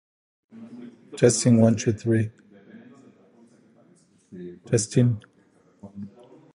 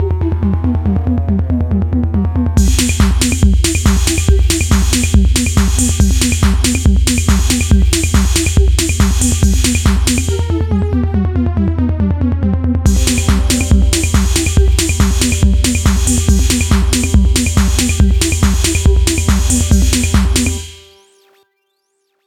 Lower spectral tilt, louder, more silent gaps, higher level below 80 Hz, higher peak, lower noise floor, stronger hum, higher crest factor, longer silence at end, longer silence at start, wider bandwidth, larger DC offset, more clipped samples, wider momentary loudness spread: first, -6 dB/octave vs -4.5 dB/octave; second, -22 LUFS vs -13 LUFS; neither; second, -58 dBFS vs -16 dBFS; second, -4 dBFS vs 0 dBFS; second, -60 dBFS vs -65 dBFS; neither; first, 22 dB vs 12 dB; second, 0.5 s vs 1.5 s; first, 0.55 s vs 0 s; second, 11.5 kHz vs 16.5 kHz; neither; neither; first, 25 LU vs 4 LU